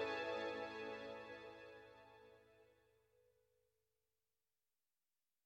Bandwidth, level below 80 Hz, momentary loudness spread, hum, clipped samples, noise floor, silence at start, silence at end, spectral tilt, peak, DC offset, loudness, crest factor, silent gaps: 16 kHz; -84 dBFS; 22 LU; none; under 0.1%; under -90 dBFS; 0 s; 2.75 s; -4 dB/octave; -32 dBFS; under 0.1%; -48 LUFS; 20 dB; none